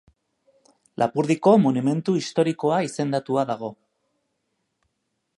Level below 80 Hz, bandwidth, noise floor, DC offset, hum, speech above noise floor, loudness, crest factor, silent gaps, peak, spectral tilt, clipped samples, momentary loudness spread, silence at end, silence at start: -70 dBFS; 11.5 kHz; -76 dBFS; under 0.1%; none; 55 dB; -22 LUFS; 20 dB; none; -4 dBFS; -6.5 dB/octave; under 0.1%; 11 LU; 1.65 s; 1 s